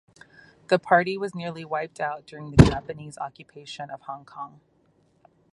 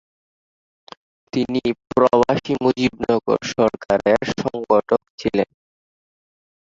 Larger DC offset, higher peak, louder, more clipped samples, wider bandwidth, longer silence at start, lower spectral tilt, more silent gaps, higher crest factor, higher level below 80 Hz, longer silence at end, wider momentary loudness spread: neither; about the same, 0 dBFS vs -2 dBFS; second, -24 LUFS vs -20 LUFS; neither; first, 11.5 kHz vs 7.8 kHz; second, 0.7 s vs 1.35 s; about the same, -7 dB/octave vs -6 dB/octave; second, none vs 5.10-5.18 s; first, 26 dB vs 20 dB; first, -40 dBFS vs -52 dBFS; second, 1.05 s vs 1.3 s; first, 22 LU vs 7 LU